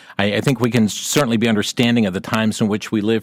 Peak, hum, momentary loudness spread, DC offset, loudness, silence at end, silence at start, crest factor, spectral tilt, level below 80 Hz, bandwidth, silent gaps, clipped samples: -4 dBFS; none; 3 LU; under 0.1%; -18 LUFS; 0 s; 0.1 s; 14 dB; -5 dB/octave; -54 dBFS; 17 kHz; none; under 0.1%